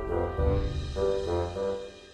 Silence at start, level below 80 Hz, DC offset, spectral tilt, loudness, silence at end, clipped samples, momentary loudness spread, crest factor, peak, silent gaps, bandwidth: 0 s; -36 dBFS; under 0.1%; -7.5 dB/octave; -30 LUFS; 0 s; under 0.1%; 5 LU; 16 dB; -14 dBFS; none; 9.8 kHz